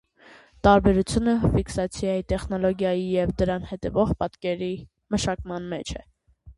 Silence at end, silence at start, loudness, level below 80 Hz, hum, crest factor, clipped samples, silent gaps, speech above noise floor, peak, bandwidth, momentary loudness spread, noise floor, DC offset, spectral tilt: 0.05 s; 0.65 s; -24 LUFS; -38 dBFS; none; 22 dB; under 0.1%; none; 29 dB; -2 dBFS; 11.5 kHz; 13 LU; -52 dBFS; under 0.1%; -6.5 dB/octave